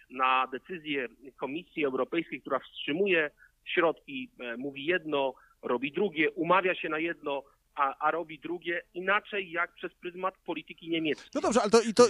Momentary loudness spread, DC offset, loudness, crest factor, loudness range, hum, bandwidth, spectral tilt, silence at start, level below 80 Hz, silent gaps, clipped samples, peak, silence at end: 13 LU; under 0.1%; -31 LUFS; 22 dB; 2 LU; none; 12 kHz; -4 dB/octave; 0.1 s; -68 dBFS; none; under 0.1%; -8 dBFS; 0 s